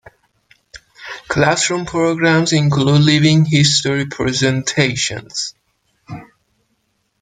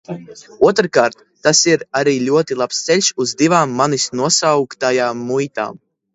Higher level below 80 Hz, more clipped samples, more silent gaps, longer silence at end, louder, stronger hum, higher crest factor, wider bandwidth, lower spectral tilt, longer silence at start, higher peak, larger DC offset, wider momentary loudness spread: first, -48 dBFS vs -60 dBFS; neither; neither; first, 1 s vs 0.4 s; about the same, -15 LUFS vs -15 LUFS; neither; about the same, 16 dB vs 16 dB; first, 9.4 kHz vs 8.2 kHz; first, -4.5 dB/octave vs -3 dB/octave; first, 0.75 s vs 0.1 s; about the same, -2 dBFS vs 0 dBFS; neither; first, 20 LU vs 8 LU